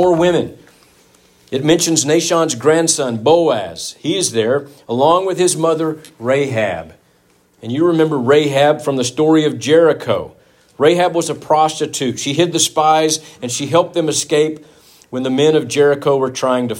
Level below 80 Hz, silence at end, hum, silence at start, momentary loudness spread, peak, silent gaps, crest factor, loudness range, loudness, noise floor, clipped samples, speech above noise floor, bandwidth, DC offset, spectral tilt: -58 dBFS; 0 s; none; 0 s; 9 LU; 0 dBFS; none; 14 dB; 2 LU; -15 LUFS; -55 dBFS; under 0.1%; 40 dB; 16.5 kHz; under 0.1%; -4 dB/octave